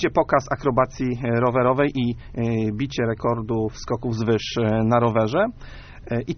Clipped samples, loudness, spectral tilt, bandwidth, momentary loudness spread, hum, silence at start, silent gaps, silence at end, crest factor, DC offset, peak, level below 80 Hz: under 0.1%; -22 LUFS; -6 dB/octave; 6.6 kHz; 8 LU; none; 0 s; none; 0 s; 18 dB; under 0.1%; -4 dBFS; -42 dBFS